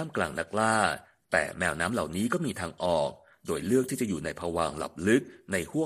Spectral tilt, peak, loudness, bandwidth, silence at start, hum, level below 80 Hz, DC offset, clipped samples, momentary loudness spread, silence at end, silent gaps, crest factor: -4.5 dB/octave; -8 dBFS; -29 LUFS; 15 kHz; 0 s; none; -56 dBFS; under 0.1%; under 0.1%; 7 LU; 0 s; none; 20 dB